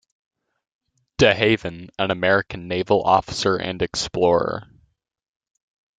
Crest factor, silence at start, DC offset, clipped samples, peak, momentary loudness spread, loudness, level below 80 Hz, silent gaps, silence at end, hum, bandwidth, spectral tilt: 20 dB; 1.2 s; under 0.1%; under 0.1%; -2 dBFS; 10 LU; -20 LUFS; -50 dBFS; none; 1.35 s; none; 9.4 kHz; -4.5 dB/octave